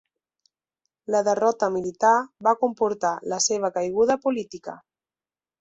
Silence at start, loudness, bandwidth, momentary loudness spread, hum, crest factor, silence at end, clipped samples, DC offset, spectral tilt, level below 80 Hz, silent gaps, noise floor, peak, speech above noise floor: 1.1 s; -23 LUFS; 8.2 kHz; 11 LU; none; 18 dB; 0.85 s; under 0.1%; under 0.1%; -3 dB/octave; -68 dBFS; none; under -90 dBFS; -6 dBFS; over 67 dB